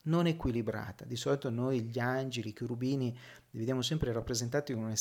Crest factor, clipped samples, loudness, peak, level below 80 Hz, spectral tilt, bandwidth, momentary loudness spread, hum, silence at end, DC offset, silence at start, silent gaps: 16 dB; under 0.1%; -35 LUFS; -18 dBFS; -54 dBFS; -5.5 dB/octave; 17 kHz; 7 LU; none; 0 s; under 0.1%; 0.05 s; none